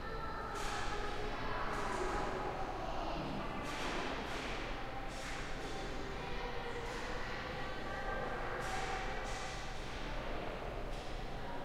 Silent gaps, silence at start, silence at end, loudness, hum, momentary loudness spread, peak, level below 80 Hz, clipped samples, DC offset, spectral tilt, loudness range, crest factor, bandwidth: none; 0 s; 0 s; -42 LUFS; none; 5 LU; -26 dBFS; -46 dBFS; under 0.1%; under 0.1%; -4.5 dB/octave; 3 LU; 14 dB; 15 kHz